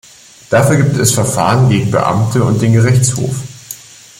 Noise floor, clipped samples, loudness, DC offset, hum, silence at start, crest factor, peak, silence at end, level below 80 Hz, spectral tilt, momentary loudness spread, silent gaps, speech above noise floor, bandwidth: -33 dBFS; under 0.1%; -12 LUFS; under 0.1%; none; 0.5 s; 12 dB; 0 dBFS; 0.45 s; -42 dBFS; -5.5 dB/octave; 15 LU; none; 22 dB; 16.5 kHz